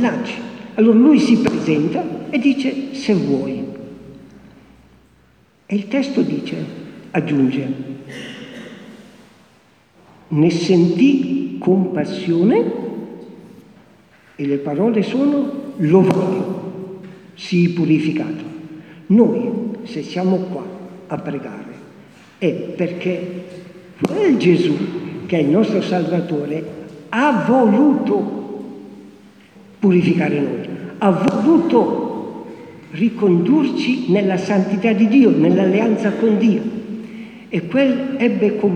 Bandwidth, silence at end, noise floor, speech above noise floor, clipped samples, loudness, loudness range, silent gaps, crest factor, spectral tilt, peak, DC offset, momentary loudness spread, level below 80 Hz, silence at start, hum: 9.4 kHz; 0 s; -54 dBFS; 38 dB; under 0.1%; -17 LUFS; 8 LU; none; 18 dB; -7.5 dB/octave; 0 dBFS; under 0.1%; 19 LU; -60 dBFS; 0 s; none